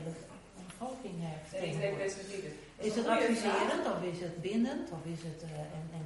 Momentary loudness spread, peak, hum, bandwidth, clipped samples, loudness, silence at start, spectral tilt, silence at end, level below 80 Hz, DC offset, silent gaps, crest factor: 14 LU; -18 dBFS; none; 11.5 kHz; under 0.1%; -36 LUFS; 0 s; -5.5 dB/octave; 0 s; -64 dBFS; under 0.1%; none; 18 dB